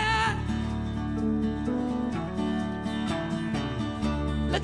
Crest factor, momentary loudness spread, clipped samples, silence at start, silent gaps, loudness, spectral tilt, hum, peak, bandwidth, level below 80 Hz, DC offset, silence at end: 16 dB; 4 LU; under 0.1%; 0 s; none; -29 LUFS; -6 dB/octave; none; -12 dBFS; 10.5 kHz; -38 dBFS; under 0.1%; 0 s